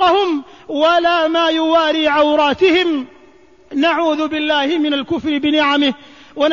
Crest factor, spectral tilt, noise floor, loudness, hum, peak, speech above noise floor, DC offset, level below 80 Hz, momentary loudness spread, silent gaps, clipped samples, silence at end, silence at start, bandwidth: 12 dB; -4 dB/octave; -47 dBFS; -15 LUFS; none; -4 dBFS; 32 dB; 0.3%; -52 dBFS; 11 LU; none; under 0.1%; 0 s; 0 s; 7.2 kHz